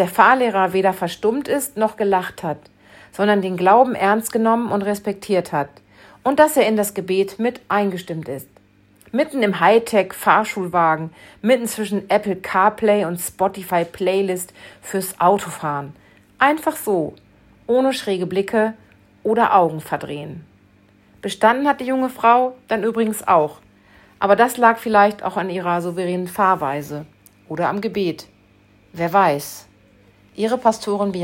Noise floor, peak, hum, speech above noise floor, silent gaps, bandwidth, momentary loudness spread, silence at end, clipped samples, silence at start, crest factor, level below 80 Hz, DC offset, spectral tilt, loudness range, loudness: -53 dBFS; 0 dBFS; none; 35 dB; none; 16.5 kHz; 13 LU; 0 s; under 0.1%; 0 s; 18 dB; -60 dBFS; under 0.1%; -5 dB/octave; 4 LU; -19 LUFS